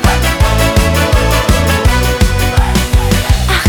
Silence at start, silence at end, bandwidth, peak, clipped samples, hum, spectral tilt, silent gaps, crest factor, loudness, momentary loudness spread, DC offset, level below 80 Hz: 0 s; 0 s; over 20 kHz; 0 dBFS; under 0.1%; none; -4.5 dB/octave; none; 10 dB; -11 LUFS; 2 LU; under 0.1%; -14 dBFS